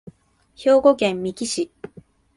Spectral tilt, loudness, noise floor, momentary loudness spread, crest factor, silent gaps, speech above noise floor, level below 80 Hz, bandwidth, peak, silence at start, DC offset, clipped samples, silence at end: -4 dB/octave; -20 LUFS; -49 dBFS; 20 LU; 18 dB; none; 30 dB; -58 dBFS; 11.5 kHz; -2 dBFS; 0.6 s; under 0.1%; under 0.1%; 0.7 s